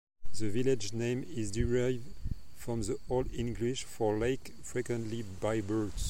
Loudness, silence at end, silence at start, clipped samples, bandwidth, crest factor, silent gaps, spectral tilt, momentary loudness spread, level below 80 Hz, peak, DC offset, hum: -35 LUFS; 0 s; 0.15 s; under 0.1%; 16.5 kHz; 14 dB; none; -5.5 dB/octave; 9 LU; -46 dBFS; -16 dBFS; under 0.1%; none